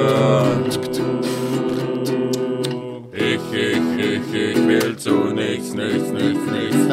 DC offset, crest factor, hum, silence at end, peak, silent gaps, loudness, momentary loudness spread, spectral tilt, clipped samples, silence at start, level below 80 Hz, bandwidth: under 0.1%; 16 dB; none; 0 s; -4 dBFS; none; -20 LUFS; 6 LU; -5.5 dB/octave; under 0.1%; 0 s; -58 dBFS; 16 kHz